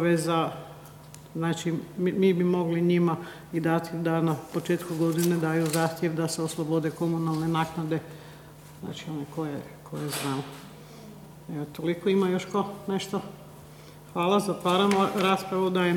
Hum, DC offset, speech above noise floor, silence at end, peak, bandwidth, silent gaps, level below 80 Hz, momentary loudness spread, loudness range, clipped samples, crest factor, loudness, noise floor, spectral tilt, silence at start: none; under 0.1%; 21 dB; 0 s; -10 dBFS; 18.5 kHz; none; -62 dBFS; 22 LU; 8 LU; under 0.1%; 18 dB; -27 LUFS; -47 dBFS; -6 dB/octave; 0 s